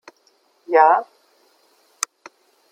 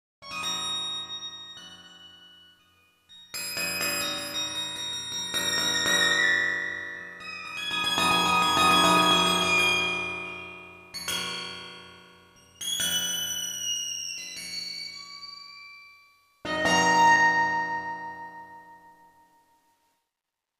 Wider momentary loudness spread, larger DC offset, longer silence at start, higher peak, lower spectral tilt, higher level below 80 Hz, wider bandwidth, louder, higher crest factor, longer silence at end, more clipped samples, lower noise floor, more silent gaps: second, 14 LU vs 21 LU; neither; first, 0.7 s vs 0.2 s; first, 0 dBFS vs -8 dBFS; about the same, -0.5 dB/octave vs -1.5 dB/octave; second, under -90 dBFS vs -64 dBFS; about the same, 16 kHz vs 15.5 kHz; first, -18 LUFS vs -25 LUFS; about the same, 22 dB vs 20 dB; about the same, 1.7 s vs 1.7 s; neither; second, -61 dBFS vs -86 dBFS; neither